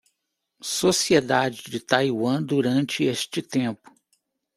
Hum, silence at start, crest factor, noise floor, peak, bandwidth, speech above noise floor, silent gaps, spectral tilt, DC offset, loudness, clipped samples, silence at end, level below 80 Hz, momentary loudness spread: none; 0.65 s; 22 dB; -79 dBFS; -2 dBFS; 15 kHz; 56 dB; none; -4 dB/octave; under 0.1%; -23 LUFS; under 0.1%; 0.8 s; -64 dBFS; 10 LU